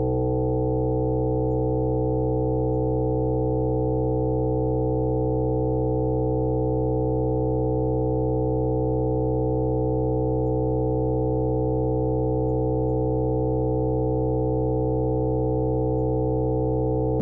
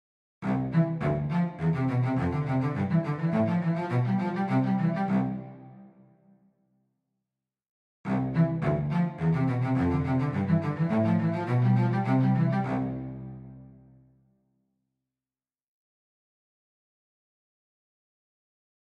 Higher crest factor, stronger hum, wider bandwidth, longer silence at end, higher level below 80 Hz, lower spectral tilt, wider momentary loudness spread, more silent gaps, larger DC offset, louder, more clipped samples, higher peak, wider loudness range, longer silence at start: second, 8 dB vs 16 dB; neither; second, 1.4 kHz vs 5.8 kHz; second, 0 s vs 5.25 s; first, -34 dBFS vs -56 dBFS; first, -16.5 dB/octave vs -10 dB/octave; second, 0 LU vs 8 LU; second, none vs 7.69-8.04 s; first, 1% vs under 0.1%; first, -24 LUFS vs -27 LUFS; neither; about the same, -16 dBFS vs -14 dBFS; second, 0 LU vs 8 LU; second, 0 s vs 0.4 s